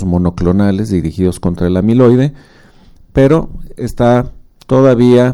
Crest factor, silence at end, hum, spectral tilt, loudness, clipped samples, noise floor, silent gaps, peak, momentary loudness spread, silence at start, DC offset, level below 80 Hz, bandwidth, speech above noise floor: 12 dB; 0 s; none; -8.5 dB/octave; -12 LUFS; under 0.1%; -41 dBFS; none; 0 dBFS; 10 LU; 0 s; under 0.1%; -30 dBFS; 12.5 kHz; 30 dB